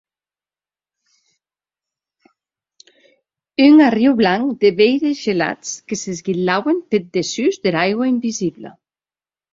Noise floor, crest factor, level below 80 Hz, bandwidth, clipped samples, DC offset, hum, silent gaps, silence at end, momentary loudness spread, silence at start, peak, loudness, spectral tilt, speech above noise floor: under -90 dBFS; 18 dB; -60 dBFS; 7.8 kHz; under 0.1%; under 0.1%; none; none; 0.85 s; 14 LU; 3.6 s; -2 dBFS; -16 LUFS; -5 dB/octave; over 74 dB